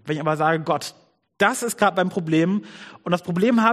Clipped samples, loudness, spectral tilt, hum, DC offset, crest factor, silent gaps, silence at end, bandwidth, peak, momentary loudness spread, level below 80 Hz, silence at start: under 0.1%; -22 LUFS; -5.5 dB/octave; none; under 0.1%; 20 dB; none; 0 s; 15.5 kHz; -2 dBFS; 8 LU; -66 dBFS; 0.05 s